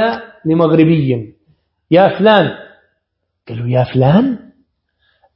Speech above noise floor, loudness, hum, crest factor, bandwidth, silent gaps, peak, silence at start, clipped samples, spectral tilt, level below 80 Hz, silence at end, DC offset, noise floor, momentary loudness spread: 60 dB; -13 LUFS; none; 14 dB; 5.8 kHz; none; 0 dBFS; 0 s; under 0.1%; -10.5 dB/octave; -48 dBFS; 1 s; under 0.1%; -71 dBFS; 16 LU